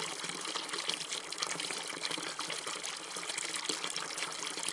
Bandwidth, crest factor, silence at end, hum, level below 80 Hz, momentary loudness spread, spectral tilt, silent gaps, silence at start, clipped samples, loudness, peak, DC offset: 11.5 kHz; 26 dB; 0 s; none; -86 dBFS; 3 LU; 0 dB/octave; none; 0 s; under 0.1%; -36 LUFS; -14 dBFS; under 0.1%